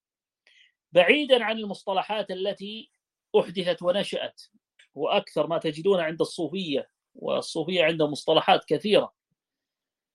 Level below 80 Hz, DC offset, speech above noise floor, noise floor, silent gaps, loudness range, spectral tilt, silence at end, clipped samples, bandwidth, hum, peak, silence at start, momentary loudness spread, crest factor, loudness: -74 dBFS; under 0.1%; 64 dB; -89 dBFS; none; 4 LU; -4.5 dB/octave; 1.05 s; under 0.1%; 12 kHz; none; -4 dBFS; 0.95 s; 11 LU; 24 dB; -25 LUFS